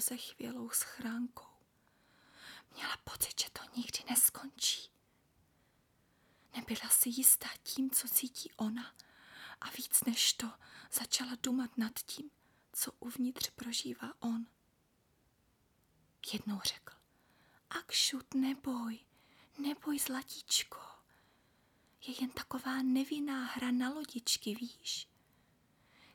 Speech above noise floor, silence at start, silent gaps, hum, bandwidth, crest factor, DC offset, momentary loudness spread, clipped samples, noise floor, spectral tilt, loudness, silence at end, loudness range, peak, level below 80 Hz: 37 dB; 0 s; none; none; 19.5 kHz; 28 dB; under 0.1%; 17 LU; under 0.1%; -74 dBFS; -1 dB/octave; -35 LUFS; 1.1 s; 10 LU; -12 dBFS; -74 dBFS